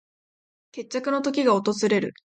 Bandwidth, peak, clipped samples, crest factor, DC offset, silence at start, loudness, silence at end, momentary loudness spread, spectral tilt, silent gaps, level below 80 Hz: 9.2 kHz; -8 dBFS; under 0.1%; 18 dB; under 0.1%; 0.75 s; -24 LUFS; 0.25 s; 14 LU; -5 dB/octave; none; -72 dBFS